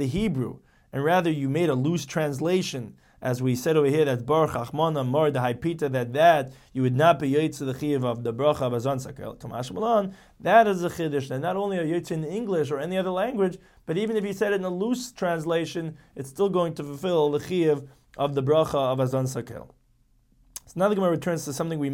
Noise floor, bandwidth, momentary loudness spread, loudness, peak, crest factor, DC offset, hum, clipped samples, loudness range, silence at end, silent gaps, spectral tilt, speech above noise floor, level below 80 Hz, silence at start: -63 dBFS; 17 kHz; 13 LU; -25 LUFS; -4 dBFS; 20 dB; under 0.1%; none; under 0.1%; 4 LU; 0 s; none; -6 dB/octave; 38 dB; -56 dBFS; 0 s